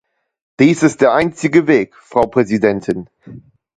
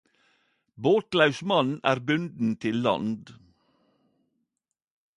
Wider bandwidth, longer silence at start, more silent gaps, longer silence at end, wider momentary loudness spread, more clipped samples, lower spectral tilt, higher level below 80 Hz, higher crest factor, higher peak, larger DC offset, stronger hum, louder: second, 9.4 kHz vs 11 kHz; second, 0.6 s vs 0.8 s; neither; second, 0.4 s vs 1.85 s; about the same, 8 LU vs 7 LU; neither; about the same, -6.5 dB/octave vs -6 dB/octave; first, -50 dBFS vs -68 dBFS; second, 16 dB vs 22 dB; first, 0 dBFS vs -6 dBFS; neither; neither; first, -14 LUFS vs -25 LUFS